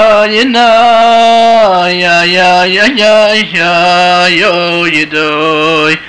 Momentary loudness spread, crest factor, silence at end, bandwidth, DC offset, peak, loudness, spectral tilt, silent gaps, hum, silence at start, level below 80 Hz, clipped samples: 4 LU; 6 dB; 0 s; 10 kHz; 1%; 0 dBFS; -6 LUFS; -3.5 dB/octave; none; none; 0 s; -46 dBFS; under 0.1%